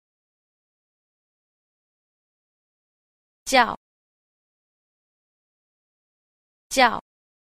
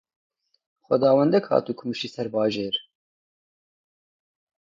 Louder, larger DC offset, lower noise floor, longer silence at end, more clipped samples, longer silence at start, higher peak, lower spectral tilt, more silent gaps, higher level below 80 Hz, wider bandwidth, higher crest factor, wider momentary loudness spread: about the same, -21 LUFS vs -23 LUFS; neither; about the same, under -90 dBFS vs under -90 dBFS; second, 0.45 s vs 1.8 s; neither; first, 3.45 s vs 0.9 s; about the same, -4 dBFS vs -6 dBFS; second, -1.5 dB/octave vs -6.5 dB/octave; first, 3.77-6.70 s vs none; first, -60 dBFS vs -70 dBFS; first, 14 kHz vs 7.6 kHz; first, 26 dB vs 20 dB; first, 17 LU vs 11 LU